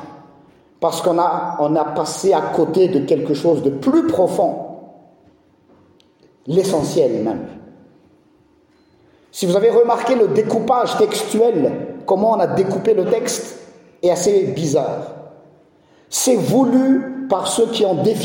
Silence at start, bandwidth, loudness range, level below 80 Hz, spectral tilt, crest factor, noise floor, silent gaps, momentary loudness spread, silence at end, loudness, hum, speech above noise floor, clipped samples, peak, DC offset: 0 s; 16.5 kHz; 6 LU; -60 dBFS; -5 dB/octave; 16 dB; -55 dBFS; none; 9 LU; 0 s; -17 LUFS; none; 38 dB; under 0.1%; -2 dBFS; under 0.1%